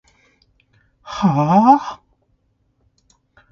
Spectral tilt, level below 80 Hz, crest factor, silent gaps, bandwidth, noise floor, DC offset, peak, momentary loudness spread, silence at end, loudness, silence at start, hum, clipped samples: -8 dB/octave; -56 dBFS; 20 dB; none; 7.2 kHz; -64 dBFS; under 0.1%; 0 dBFS; 20 LU; 1.55 s; -15 LUFS; 1.05 s; none; under 0.1%